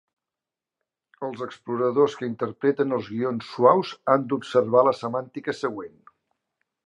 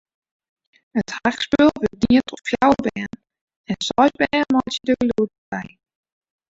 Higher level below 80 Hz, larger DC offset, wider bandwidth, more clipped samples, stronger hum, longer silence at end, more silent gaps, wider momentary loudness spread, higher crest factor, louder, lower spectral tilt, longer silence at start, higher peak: second, -72 dBFS vs -50 dBFS; neither; first, 9 kHz vs 8 kHz; neither; neither; first, 1 s vs 0.8 s; second, none vs 3.41-3.48 s, 3.56-3.64 s, 5.38-5.52 s; about the same, 14 LU vs 14 LU; about the same, 22 dB vs 18 dB; second, -24 LUFS vs -20 LUFS; first, -7 dB/octave vs -5 dB/octave; first, 1.2 s vs 0.95 s; about the same, -4 dBFS vs -2 dBFS